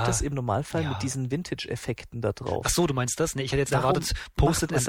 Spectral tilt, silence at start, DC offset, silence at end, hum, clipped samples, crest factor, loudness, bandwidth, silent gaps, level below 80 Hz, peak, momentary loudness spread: -4.5 dB/octave; 0 s; under 0.1%; 0 s; none; under 0.1%; 16 dB; -27 LUFS; 17.5 kHz; none; -38 dBFS; -10 dBFS; 8 LU